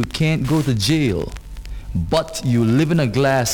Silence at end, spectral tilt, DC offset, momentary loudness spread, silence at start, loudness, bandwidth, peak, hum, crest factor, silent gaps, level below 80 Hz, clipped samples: 0 s; -5.5 dB/octave; under 0.1%; 14 LU; 0 s; -19 LUFS; 18.5 kHz; -4 dBFS; none; 14 dB; none; -34 dBFS; under 0.1%